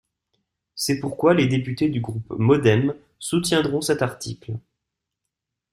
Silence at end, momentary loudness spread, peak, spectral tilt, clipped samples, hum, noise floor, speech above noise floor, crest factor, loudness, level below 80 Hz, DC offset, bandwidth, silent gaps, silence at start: 1.15 s; 16 LU; -4 dBFS; -5.5 dB/octave; under 0.1%; none; -83 dBFS; 62 dB; 20 dB; -22 LUFS; -54 dBFS; under 0.1%; 15 kHz; none; 0.75 s